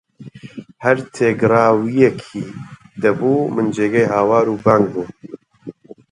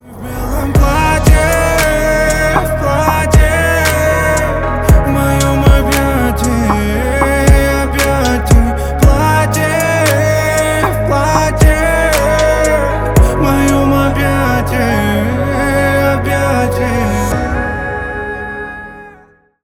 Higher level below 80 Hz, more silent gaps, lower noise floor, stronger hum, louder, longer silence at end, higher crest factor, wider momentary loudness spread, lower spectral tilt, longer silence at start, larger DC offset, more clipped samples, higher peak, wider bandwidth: second, -56 dBFS vs -16 dBFS; neither; second, -38 dBFS vs -45 dBFS; neither; second, -16 LUFS vs -12 LUFS; second, 0.2 s vs 0.55 s; first, 18 dB vs 12 dB; first, 22 LU vs 6 LU; first, -7.5 dB/octave vs -5.5 dB/octave; first, 0.2 s vs 0.05 s; neither; neither; about the same, 0 dBFS vs 0 dBFS; second, 10.5 kHz vs 17.5 kHz